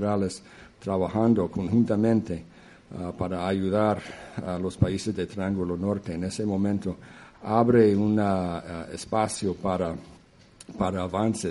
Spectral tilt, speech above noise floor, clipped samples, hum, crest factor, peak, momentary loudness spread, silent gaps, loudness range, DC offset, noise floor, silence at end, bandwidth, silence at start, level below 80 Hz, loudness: -7 dB/octave; 27 dB; under 0.1%; none; 20 dB; -6 dBFS; 14 LU; none; 4 LU; under 0.1%; -53 dBFS; 0 s; 11.5 kHz; 0 s; -52 dBFS; -26 LUFS